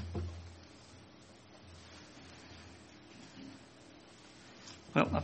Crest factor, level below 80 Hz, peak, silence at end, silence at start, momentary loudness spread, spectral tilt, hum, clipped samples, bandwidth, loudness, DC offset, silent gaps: 30 dB; -58 dBFS; -12 dBFS; 0 s; 0 s; 18 LU; -6 dB/octave; none; under 0.1%; 8.4 kHz; -43 LUFS; under 0.1%; none